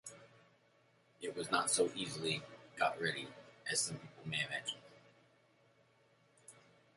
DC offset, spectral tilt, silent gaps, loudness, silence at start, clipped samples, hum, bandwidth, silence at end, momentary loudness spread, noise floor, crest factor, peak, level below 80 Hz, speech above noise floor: under 0.1%; -2 dB/octave; none; -38 LUFS; 0.05 s; under 0.1%; none; 11.5 kHz; 0.35 s; 18 LU; -71 dBFS; 26 dB; -16 dBFS; -80 dBFS; 33 dB